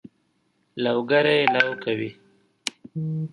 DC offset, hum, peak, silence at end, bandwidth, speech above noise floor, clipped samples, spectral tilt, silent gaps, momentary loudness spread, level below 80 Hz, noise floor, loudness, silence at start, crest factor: under 0.1%; none; 0 dBFS; 0.05 s; 11.5 kHz; 46 dB; under 0.1%; -5 dB/octave; none; 14 LU; -72 dBFS; -69 dBFS; -23 LUFS; 0.75 s; 24 dB